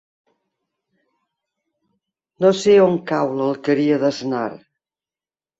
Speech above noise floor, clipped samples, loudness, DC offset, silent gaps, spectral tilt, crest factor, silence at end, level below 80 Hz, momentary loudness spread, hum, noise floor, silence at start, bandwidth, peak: over 73 dB; under 0.1%; -18 LUFS; under 0.1%; none; -6 dB/octave; 18 dB; 1.05 s; -64 dBFS; 11 LU; none; under -90 dBFS; 2.4 s; 8 kHz; -2 dBFS